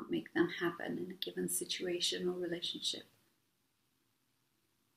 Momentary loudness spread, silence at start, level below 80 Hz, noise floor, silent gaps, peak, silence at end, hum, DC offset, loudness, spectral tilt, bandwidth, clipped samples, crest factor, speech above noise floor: 7 LU; 0 s; -80 dBFS; -80 dBFS; none; -20 dBFS; 1.9 s; none; under 0.1%; -37 LUFS; -3 dB/octave; 15.5 kHz; under 0.1%; 20 dB; 40 dB